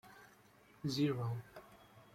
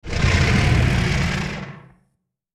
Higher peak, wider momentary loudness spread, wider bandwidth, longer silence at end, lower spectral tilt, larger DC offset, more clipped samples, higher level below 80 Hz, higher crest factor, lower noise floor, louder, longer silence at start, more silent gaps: second, -24 dBFS vs -6 dBFS; first, 24 LU vs 13 LU; first, 16 kHz vs 13 kHz; second, 0.15 s vs 0.75 s; about the same, -6.5 dB/octave vs -5.5 dB/octave; neither; neither; second, -74 dBFS vs -28 dBFS; about the same, 18 dB vs 14 dB; second, -65 dBFS vs -71 dBFS; second, -39 LUFS vs -19 LUFS; about the same, 0.05 s vs 0.05 s; neither